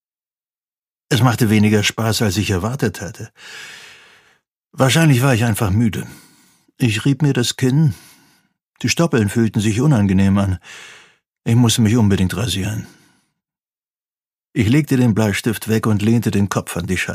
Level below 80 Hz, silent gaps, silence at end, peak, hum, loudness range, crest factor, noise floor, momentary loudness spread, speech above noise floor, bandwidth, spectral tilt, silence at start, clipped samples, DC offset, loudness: -48 dBFS; 4.52-4.56 s; 0 s; 0 dBFS; none; 3 LU; 18 dB; under -90 dBFS; 16 LU; over 74 dB; 15.5 kHz; -5.5 dB/octave; 1.1 s; under 0.1%; under 0.1%; -17 LUFS